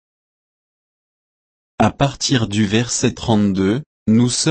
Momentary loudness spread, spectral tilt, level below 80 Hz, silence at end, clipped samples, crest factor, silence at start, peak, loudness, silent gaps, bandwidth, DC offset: 3 LU; -4.5 dB/octave; -44 dBFS; 0 s; under 0.1%; 16 dB; 1.8 s; -2 dBFS; -17 LUFS; 3.86-4.06 s; 8.8 kHz; under 0.1%